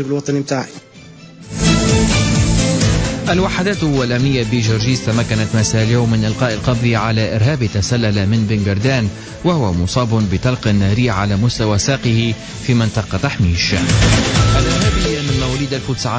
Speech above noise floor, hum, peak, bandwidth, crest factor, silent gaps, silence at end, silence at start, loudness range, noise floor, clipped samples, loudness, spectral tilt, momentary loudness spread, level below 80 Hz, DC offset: 23 dB; none; -2 dBFS; 8 kHz; 12 dB; none; 0 s; 0 s; 1 LU; -38 dBFS; under 0.1%; -15 LUFS; -5 dB/octave; 5 LU; -26 dBFS; under 0.1%